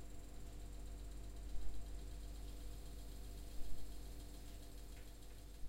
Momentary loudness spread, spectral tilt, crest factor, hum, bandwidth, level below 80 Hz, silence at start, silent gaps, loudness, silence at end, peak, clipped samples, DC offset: 4 LU; -5 dB/octave; 16 dB; none; 16 kHz; -50 dBFS; 0 s; none; -55 LUFS; 0 s; -28 dBFS; under 0.1%; under 0.1%